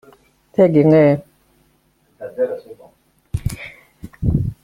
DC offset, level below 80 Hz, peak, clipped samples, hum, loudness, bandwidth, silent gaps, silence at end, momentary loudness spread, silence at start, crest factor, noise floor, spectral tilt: under 0.1%; -38 dBFS; -2 dBFS; under 0.1%; none; -17 LUFS; 15.5 kHz; none; 0.1 s; 21 LU; 0.6 s; 18 dB; -60 dBFS; -9 dB/octave